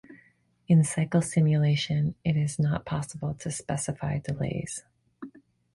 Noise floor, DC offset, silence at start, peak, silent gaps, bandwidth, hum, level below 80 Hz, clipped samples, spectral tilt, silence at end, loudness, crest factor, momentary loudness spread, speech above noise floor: -63 dBFS; under 0.1%; 0.1 s; -12 dBFS; none; 11.5 kHz; none; -54 dBFS; under 0.1%; -6 dB/octave; 0.45 s; -27 LUFS; 16 dB; 15 LU; 37 dB